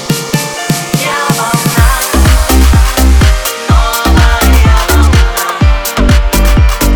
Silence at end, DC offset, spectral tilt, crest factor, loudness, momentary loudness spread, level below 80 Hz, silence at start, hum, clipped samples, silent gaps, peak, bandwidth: 0 s; under 0.1%; -4.5 dB/octave; 8 dB; -9 LUFS; 5 LU; -10 dBFS; 0 s; none; 0.8%; none; 0 dBFS; over 20 kHz